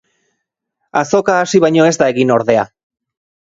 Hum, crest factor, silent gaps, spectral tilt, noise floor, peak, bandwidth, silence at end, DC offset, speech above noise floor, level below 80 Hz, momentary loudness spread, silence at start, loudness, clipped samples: none; 14 dB; none; -5 dB/octave; -73 dBFS; 0 dBFS; 8 kHz; 0.95 s; under 0.1%; 62 dB; -56 dBFS; 8 LU; 0.95 s; -13 LUFS; under 0.1%